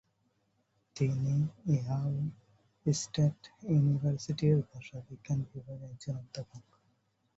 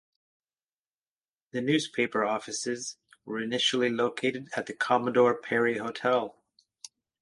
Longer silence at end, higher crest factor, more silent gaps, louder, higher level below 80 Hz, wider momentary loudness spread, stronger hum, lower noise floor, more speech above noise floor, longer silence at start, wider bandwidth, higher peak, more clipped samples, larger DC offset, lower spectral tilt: second, 0.75 s vs 0.9 s; about the same, 18 dB vs 20 dB; neither; second, -33 LUFS vs -28 LUFS; first, -64 dBFS vs -74 dBFS; about the same, 17 LU vs 15 LU; neither; second, -75 dBFS vs under -90 dBFS; second, 43 dB vs over 62 dB; second, 0.95 s vs 1.55 s; second, 8 kHz vs 11.5 kHz; second, -16 dBFS vs -10 dBFS; neither; neither; first, -7 dB/octave vs -3.5 dB/octave